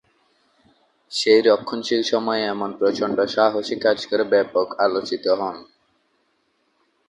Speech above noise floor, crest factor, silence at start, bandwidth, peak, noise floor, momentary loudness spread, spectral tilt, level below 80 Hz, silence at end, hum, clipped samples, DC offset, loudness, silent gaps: 47 dB; 20 dB; 1.1 s; 11.5 kHz; -2 dBFS; -67 dBFS; 7 LU; -4 dB/octave; -66 dBFS; 1.45 s; none; under 0.1%; under 0.1%; -20 LUFS; none